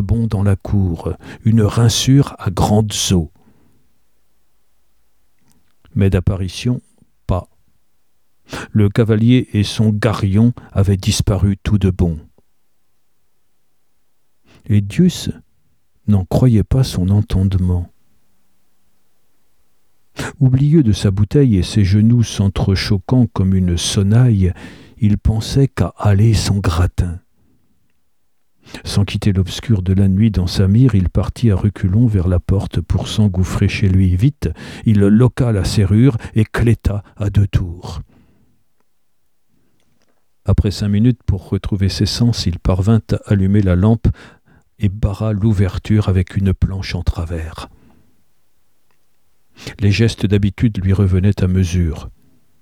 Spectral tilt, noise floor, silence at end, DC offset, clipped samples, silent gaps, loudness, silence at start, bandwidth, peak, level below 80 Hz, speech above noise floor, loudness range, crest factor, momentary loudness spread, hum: -6.5 dB/octave; -70 dBFS; 0.5 s; 0.2%; under 0.1%; none; -16 LUFS; 0 s; 13.5 kHz; 0 dBFS; -30 dBFS; 56 dB; 8 LU; 14 dB; 10 LU; none